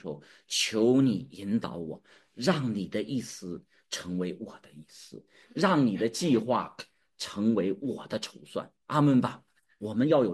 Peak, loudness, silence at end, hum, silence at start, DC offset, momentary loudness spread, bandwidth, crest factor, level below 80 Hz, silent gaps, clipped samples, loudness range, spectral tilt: -10 dBFS; -29 LUFS; 0 s; none; 0.05 s; under 0.1%; 20 LU; 12.5 kHz; 18 dB; -70 dBFS; none; under 0.1%; 5 LU; -5.5 dB/octave